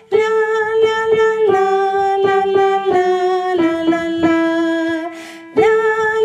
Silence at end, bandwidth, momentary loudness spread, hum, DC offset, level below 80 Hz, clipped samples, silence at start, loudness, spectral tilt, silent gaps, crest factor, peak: 0 s; 10 kHz; 4 LU; none; under 0.1%; -58 dBFS; under 0.1%; 0.1 s; -15 LUFS; -5 dB/octave; none; 12 dB; -2 dBFS